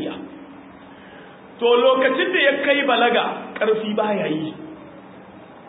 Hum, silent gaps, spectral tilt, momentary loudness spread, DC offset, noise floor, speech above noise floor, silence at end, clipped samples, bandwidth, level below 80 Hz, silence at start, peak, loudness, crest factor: none; none; -9 dB/octave; 21 LU; under 0.1%; -42 dBFS; 24 dB; 0 s; under 0.1%; 4 kHz; -66 dBFS; 0 s; -4 dBFS; -19 LUFS; 18 dB